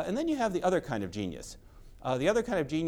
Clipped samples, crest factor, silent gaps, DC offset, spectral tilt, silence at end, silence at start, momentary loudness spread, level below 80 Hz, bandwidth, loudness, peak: under 0.1%; 16 dB; none; under 0.1%; -5.5 dB/octave; 0 s; 0 s; 12 LU; -52 dBFS; 17.5 kHz; -31 LUFS; -14 dBFS